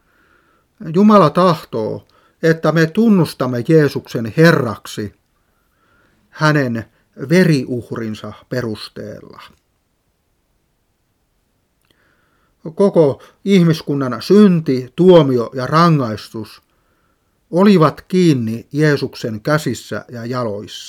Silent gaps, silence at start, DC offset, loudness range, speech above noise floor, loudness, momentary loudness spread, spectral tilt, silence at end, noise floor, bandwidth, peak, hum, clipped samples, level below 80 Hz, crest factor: none; 0.8 s; under 0.1%; 8 LU; 50 dB; -15 LUFS; 17 LU; -7 dB/octave; 0 s; -64 dBFS; 15.5 kHz; 0 dBFS; none; under 0.1%; -56 dBFS; 16 dB